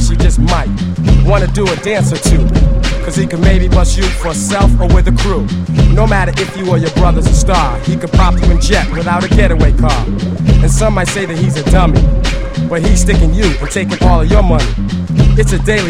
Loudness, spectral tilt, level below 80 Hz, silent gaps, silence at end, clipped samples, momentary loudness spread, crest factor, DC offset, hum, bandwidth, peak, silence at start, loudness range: -12 LUFS; -5.5 dB/octave; -12 dBFS; none; 0 s; 0.2%; 5 LU; 10 dB; under 0.1%; none; 11.5 kHz; 0 dBFS; 0 s; 1 LU